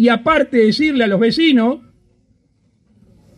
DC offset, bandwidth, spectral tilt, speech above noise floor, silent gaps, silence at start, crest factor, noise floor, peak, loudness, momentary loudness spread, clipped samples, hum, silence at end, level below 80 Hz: under 0.1%; 10.5 kHz; -6 dB/octave; 45 dB; none; 0 s; 14 dB; -59 dBFS; -2 dBFS; -14 LUFS; 4 LU; under 0.1%; none; 1.6 s; -50 dBFS